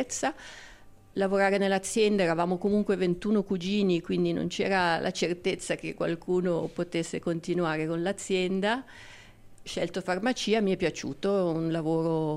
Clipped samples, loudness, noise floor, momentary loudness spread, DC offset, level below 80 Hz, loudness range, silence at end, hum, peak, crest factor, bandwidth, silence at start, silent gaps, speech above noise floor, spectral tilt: under 0.1%; -28 LUFS; -49 dBFS; 7 LU; under 0.1%; -58 dBFS; 4 LU; 0 s; none; -14 dBFS; 14 dB; 13 kHz; 0 s; none; 22 dB; -5 dB/octave